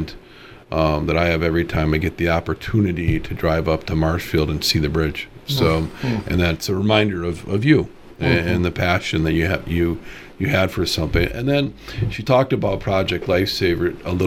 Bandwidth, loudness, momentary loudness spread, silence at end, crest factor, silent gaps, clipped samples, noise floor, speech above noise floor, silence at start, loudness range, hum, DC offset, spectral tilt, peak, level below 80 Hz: 17 kHz; -20 LUFS; 7 LU; 0 s; 18 dB; none; under 0.1%; -43 dBFS; 23 dB; 0 s; 1 LU; none; under 0.1%; -6 dB/octave; -2 dBFS; -36 dBFS